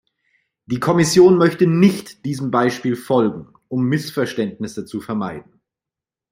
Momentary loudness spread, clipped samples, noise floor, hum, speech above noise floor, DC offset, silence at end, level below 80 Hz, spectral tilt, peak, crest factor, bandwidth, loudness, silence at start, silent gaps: 16 LU; under 0.1%; -88 dBFS; none; 70 dB; under 0.1%; 0.9 s; -56 dBFS; -6 dB/octave; -2 dBFS; 16 dB; 16 kHz; -18 LUFS; 0.7 s; none